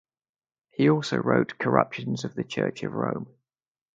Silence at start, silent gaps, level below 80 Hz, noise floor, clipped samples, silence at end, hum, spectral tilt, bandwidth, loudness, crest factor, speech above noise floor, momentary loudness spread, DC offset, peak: 0.8 s; none; -66 dBFS; under -90 dBFS; under 0.1%; 0.7 s; none; -6.5 dB/octave; 9 kHz; -26 LUFS; 26 dB; over 65 dB; 10 LU; under 0.1%; -2 dBFS